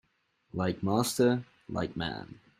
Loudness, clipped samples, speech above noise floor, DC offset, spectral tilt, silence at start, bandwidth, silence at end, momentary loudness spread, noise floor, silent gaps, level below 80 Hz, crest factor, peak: -31 LUFS; under 0.1%; 42 dB; under 0.1%; -5.5 dB/octave; 0.55 s; 15.5 kHz; 0.25 s; 13 LU; -72 dBFS; none; -60 dBFS; 20 dB; -12 dBFS